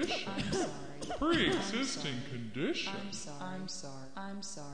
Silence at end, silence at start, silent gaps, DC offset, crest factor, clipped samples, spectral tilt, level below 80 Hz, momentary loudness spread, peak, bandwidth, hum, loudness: 0 s; 0 s; none; 0.5%; 20 dB; under 0.1%; -4 dB/octave; -58 dBFS; 14 LU; -16 dBFS; 10 kHz; none; -36 LUFS